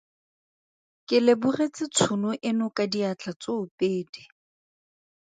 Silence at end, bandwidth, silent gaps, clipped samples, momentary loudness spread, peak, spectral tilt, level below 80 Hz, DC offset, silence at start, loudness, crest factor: 1.1 s; 9.4 kHz; 3.36-3.40 s, 3.71-3.78 s, 4.09-4.13 s; under 0.1%; 11 LU; -6 dBFS; -4.5 dB/octave; -72 dBFS; under 0.1%; 1.1 s; -26 LUFS; 20 dB